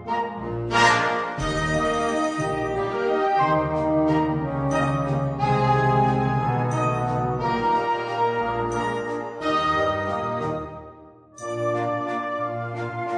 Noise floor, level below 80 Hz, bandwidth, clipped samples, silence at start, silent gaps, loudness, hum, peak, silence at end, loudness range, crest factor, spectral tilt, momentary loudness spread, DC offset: -46 dBFS; -44 dBFS; 10.5 kHz; under 0.1%; 0 s; none; -23 LUFS; none; -6 dBFS; 0 s; 4 LU; 18 dB; -6 dB/octave; 9 LU; under 0.1%